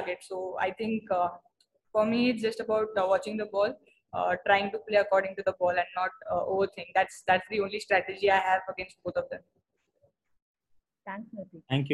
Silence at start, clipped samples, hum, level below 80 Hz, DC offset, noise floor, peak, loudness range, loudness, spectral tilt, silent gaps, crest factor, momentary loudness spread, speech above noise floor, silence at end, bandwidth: 0 s; under 0.1%; none; -68 dBFS; under 0.1%; -71 dBFS; -8 dBFS; 4 LU; -29 LUFS; -5.5 dB/octave; 10.42-10.54 s; 20 dB; 14 LU; 42 dB; 0 s; 12 kHz